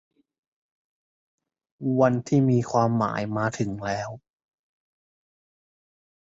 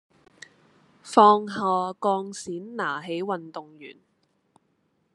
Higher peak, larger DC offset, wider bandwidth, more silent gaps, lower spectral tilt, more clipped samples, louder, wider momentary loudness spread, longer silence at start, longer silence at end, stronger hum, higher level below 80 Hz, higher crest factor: second, -8 dBFS vs -2 dBFS; neither; second, 8 kHz vs 11.5 kHz; neither; first, -7.5 dB/octave vs -5 dB/octave; neither; about the same, -24 LUFS vs -24 LUFS; second, 10 LU vs 23 LU; first, 1.8 s vs 1.05 s; first, 2.1 s vs 1.25 s; neither; first, -60 dBFS vs -78 dBFS; about the same, 20 dB vs 24 dB